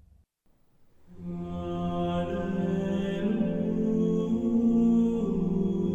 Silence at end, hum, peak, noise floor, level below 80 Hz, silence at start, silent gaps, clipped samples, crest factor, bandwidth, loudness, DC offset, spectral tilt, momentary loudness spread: 0 s; none; -16 dBFS; -65 dBFS; -50 dBFS; 1.1 s; none; under 0.1%; 12 dB; 7.6 kHz; -28 LUFS; under 0.1%; -9 dB/octave; 11 LU